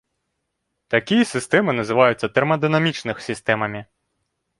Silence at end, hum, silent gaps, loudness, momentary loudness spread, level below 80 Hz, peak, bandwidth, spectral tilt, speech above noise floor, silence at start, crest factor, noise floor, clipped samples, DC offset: 0.75 s; none; none; -20 LUFS; 10 LU; -58 dBFS; -2 dBFS; 11.5 kHz; -5.5 dB/octave; 57 dB; 0.9 s; 20 dB; -76 dBFS; under 0.1%; under 0.1%